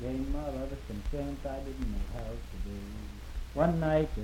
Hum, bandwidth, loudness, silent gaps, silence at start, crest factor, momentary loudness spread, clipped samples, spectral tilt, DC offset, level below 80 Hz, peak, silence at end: none; 16.5 kHz; -35 LUFS; none; 0 s; 20 dB; 14 LU; under 0.1%; -7.5 dB/octave; under 0.1%; -38 dBFS; -14 dBFS; 0 s